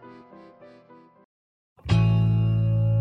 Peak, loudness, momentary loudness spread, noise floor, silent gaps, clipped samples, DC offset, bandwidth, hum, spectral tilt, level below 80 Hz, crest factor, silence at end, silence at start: -10 dBFS; -22 LUFS; 4 LU; -52 dBFS; 1.25-1.76 s; under 0.1%; under 0.1%; 6 kHz; none; -8.5 dB/octave; -42 dBFS; 14 dB; 0 s; 0.05 s